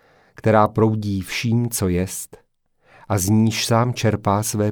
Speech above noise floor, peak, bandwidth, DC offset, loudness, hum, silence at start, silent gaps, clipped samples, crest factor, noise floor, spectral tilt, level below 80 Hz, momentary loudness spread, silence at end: 40 dB; -2 dBFS; 19 kHz; under 0.1%; -20 LUFS; none; 0.45 s; none; under 0.1%; 18 dB; -59 dBFS; -5.5 dB/octave; -48 dBFS; 8 LU; 0 s